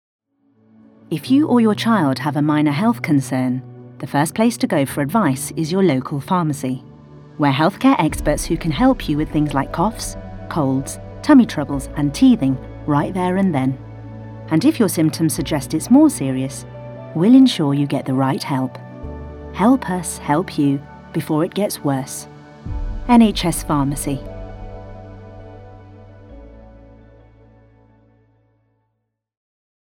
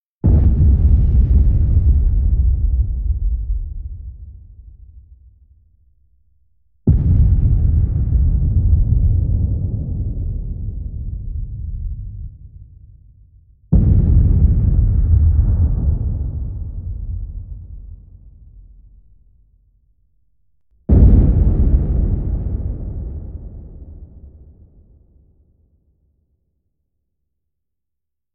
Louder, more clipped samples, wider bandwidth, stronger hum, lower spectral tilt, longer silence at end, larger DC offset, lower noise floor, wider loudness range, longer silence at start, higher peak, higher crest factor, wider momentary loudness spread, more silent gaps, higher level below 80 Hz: about the same, -18 LUFS vs -18 LUFS; neither; first, 17 kHz vs 1.6 kHz; neither; second, -6 dB/octave vs -14.5 dB/octave; second, 3.15 s vs 4.05 s; neither; second, -74 dBFS vs -84 dBFS; second, 4 LU vs 16 LU; first, 1.1 s vs 0.25 s; about the same, -2 dBFS vs -2 dBFS; about the same, 16 dB vs 16 dB; about the same, 20 LU vs 19 LU; neither; second, -38 dBFS vs -18 dBFS